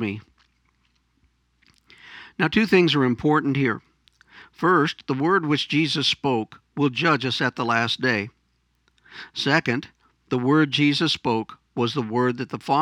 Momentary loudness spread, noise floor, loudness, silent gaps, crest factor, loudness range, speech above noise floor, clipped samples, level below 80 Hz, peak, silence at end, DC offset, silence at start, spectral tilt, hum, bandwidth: 11 LU; -68 dBFS; -22 LUFS; none; 20 dB; 3 LU; 46 dB; under 0.1%; -60 dBFS; -2 dBFS; 0 s; under 0.1%; 0 s; -5.5 dB/octave; none; 11.5 kHz